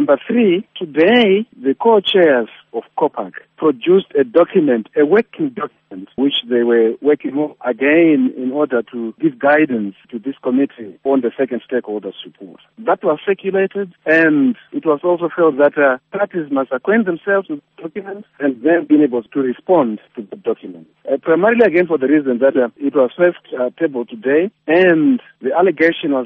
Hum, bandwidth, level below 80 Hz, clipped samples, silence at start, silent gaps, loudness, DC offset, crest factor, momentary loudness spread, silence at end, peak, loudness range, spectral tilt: none; 4.9 kHz; -64 dBFS; under 0.1%; 0 s; none; -16 LUFS; under 0.1%; 16 dB; 14 LU; 0 s; 0 dBFS; 3 LU; -3.5 dB/octave